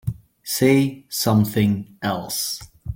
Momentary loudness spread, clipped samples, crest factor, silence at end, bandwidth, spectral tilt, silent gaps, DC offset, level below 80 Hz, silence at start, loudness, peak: 12 LU; under 0.1%; 18 dB; 0 s; 17 kHz; -5 dB/octave; none; under 0.1%; -46 dBFS; 0.05 s; -21 LUFS; -4 dBFS